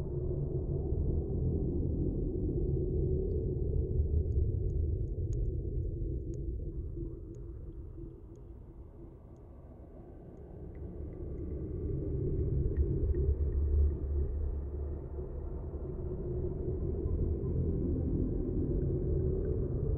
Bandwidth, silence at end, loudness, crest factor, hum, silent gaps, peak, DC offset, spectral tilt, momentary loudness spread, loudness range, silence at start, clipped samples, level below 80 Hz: 2 kHz; 0 s; -35 LUFS; 14 dB; none; none; -18 dBFS; under 0.1%; -15 dB/octave; 18 LU; 13 LU; 0 s; under 0.1%; -38 dBFS